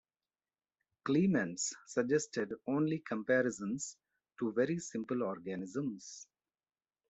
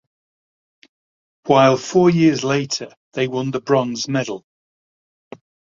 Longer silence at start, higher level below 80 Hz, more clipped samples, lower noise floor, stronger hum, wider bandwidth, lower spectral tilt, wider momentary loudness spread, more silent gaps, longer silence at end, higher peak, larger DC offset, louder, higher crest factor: second, 1.05 s vs 1.45 s; second, -78 dBFS vs -60 dBFS; neither; about the same, under -90 dBFS vs under -90 dBFS; neither; about the same, 8.2 kHz vs 7.6 kHz; about the same, -5 dB/octave vs -5.5 dB/octave; second, 10 LU vs 14 LU; second, none vs 2.97-3.11 s; second, 0.85 s vs 1.35 s; second, -18 dBFS vs -2 dBFS; neither; second, -36 LUFS vs -18 LUFS; about the same, 18 dB vs 18 dB